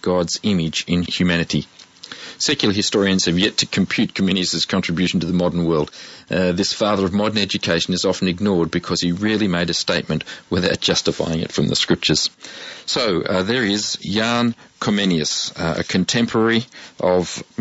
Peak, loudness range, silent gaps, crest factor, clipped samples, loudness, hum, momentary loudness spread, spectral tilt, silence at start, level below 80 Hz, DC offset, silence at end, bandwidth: -2 dBFS; 1 LU; none; 18 dB; under 0.1%; -19 LUFS; none; 6 LU; -4 dB/octave; 0 s; -48 dBFS; under 0.1%; 0.15 s; 8 kHz